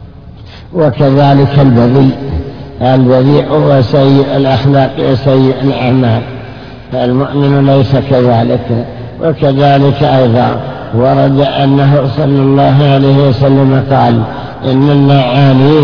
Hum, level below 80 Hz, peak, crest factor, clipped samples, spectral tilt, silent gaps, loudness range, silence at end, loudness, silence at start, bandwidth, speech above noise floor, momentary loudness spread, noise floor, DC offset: none; -34 dBFS; 0 dBFS; 8 dB; 2%; -9.5 dB/octave; none; 3 LU; 0 s; -9 LUFS; 0 s; 5.4 kHz; 23 dB; 9 LU; -30 dBFS; under 0.1%